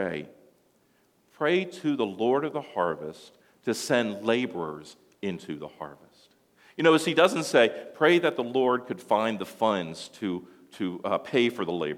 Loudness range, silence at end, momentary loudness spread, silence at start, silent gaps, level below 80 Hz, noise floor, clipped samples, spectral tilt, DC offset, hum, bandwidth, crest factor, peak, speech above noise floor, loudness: 7 LU; 0 s; 15 LU; 0 s; none; -74 dBFS; -66 dBFS; under 0.1%; -4.5 dB/octave; under 0.1%; none; 16.5 kHz; 22 dB; -6 dBFS; 40 dB; -27 LUFS